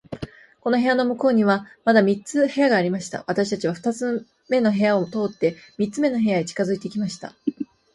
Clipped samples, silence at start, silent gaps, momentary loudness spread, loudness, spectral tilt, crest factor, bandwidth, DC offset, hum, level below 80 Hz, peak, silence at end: under 0.1%; 0.1 s; none; 11 LU; -22 LUFS; -6 dB/octave; 18 dB; 11.5 kHz; under 0.1%; none; -60 dBFS; -4 dBFS; 0.3 s